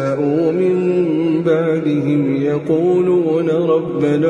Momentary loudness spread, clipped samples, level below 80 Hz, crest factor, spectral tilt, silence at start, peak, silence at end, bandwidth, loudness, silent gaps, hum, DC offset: 3 LU; under 0.1%; -58 dBFS; 12 dB; -9 dB/octave; 0 s; -4 dBFS; 0 s; 9.4 kHz; -16 LUFS; none; none; under 0.1%